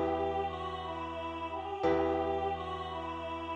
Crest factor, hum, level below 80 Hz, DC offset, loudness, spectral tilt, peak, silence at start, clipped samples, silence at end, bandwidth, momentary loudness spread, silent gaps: 18 dB; none; -52 dBFS; under 0.1%; -35 LUFS; -7 dB/octave; -18 dBFS; 0 s; under 0.1%; 0 s; 8.8 kHz; 8 LU; none